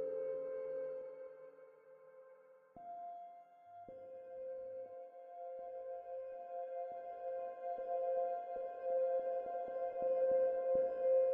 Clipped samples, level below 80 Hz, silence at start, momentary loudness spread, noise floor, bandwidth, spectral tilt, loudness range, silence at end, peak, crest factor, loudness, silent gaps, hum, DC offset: under 0.1%; -82 dBFS; 0 s; 22 LU; -63 dBFS; 3.3 kHz; -5 dB/octave; 15 LU; 0 s; -26 dBFS; 16 dB; -41 LUFS; none; none; under 0.1%